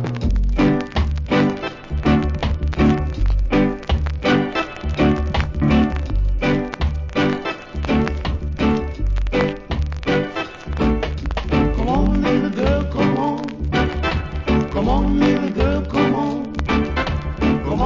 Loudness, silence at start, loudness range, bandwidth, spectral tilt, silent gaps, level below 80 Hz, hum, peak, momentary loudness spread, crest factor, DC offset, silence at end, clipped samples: -20 LUFS; 0 s; 2 LU; 7.6 kHz; -7.5 dB/octave; none; -24 dBFS; none; -2 dBFS; 6 LU; 16 dB; under 0.1%; 0 s; under 0.1%